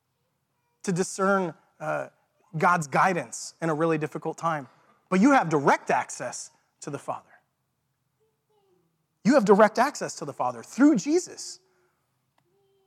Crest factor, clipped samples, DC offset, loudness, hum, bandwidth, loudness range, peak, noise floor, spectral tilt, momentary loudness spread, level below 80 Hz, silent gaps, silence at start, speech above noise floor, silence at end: 22 dB; under 0.1%; under 0.1%; -25 LUFS; none; 14 kHz; 6 LU; -4 dBFS; -76 dBFS; -5.5 dB/octave; 18 LU; -78 dBFS; none; 0.85 s; 52 dB; 1.3 s